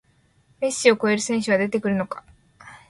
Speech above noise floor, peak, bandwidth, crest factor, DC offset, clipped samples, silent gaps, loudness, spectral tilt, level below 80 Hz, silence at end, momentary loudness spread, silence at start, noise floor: 39 dB; -4 dBFS; 11.5 kHz; 20 dB; under 0.1%; under 0.1%; none; -22 LUFS; -4 dB/octave; -62 dBFS; 0.15 s; 11 LU; 0.6 s; -61 dBFS